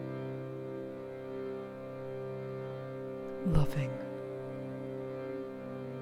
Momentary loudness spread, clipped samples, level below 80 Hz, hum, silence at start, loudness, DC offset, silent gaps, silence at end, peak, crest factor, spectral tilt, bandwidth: 10 LU; under 0.1%; -48 dBFS; none; 0 s; -39 LUFS; under 0.1%; none; 0 s; -14 dBFS; 22 dB; -8.5 dB/octave; 15 kHz